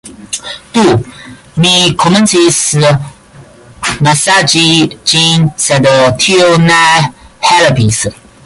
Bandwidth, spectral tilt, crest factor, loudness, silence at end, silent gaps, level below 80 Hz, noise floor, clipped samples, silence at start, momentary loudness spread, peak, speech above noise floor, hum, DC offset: 11.5 kHz; -3.5 dB/octave; 10 dB; -8 LUFS; 0.35 s; none; -40 dBFS; -36 dBFS; under 0.1%; 0.05 s; 12 LU; 0 dBFS; 28 dB; none; under 0.1%